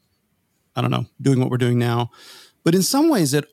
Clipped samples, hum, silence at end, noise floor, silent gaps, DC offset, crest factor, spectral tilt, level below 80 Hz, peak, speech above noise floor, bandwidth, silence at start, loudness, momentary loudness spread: under 0.1%; none; 0.1 s; -68 dBFS; none; under 0.1%; 14 dB; -5.5 dB/octave; -66 dBFS; -6 dBFS; 49 dB; 16 kHz; 0.75 s; -20 LUFS; 8 LU